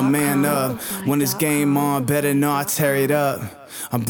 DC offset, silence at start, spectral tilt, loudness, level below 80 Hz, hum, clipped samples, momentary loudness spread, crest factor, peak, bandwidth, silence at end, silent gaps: under 0.1%; 0 s; -5 dB/octave; -20 LUFS; -58 dBFS; none; under 0.1%; 7 LU; 16 dB; -4 dBFS; over 20 kHz; 0 s; none